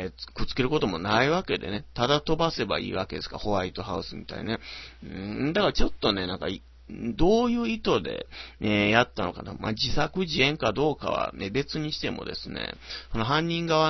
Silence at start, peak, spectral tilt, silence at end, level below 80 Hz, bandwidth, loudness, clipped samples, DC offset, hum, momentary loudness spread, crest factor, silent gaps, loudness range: 0 s; -6 dBFS; -5.5 dB/octave; 0 s; -40 dBFS; 6.2 kHz; -27 LUFS; under 0.1%; under 0.1%; none; 13 LU; 22 dB; none; 4 LU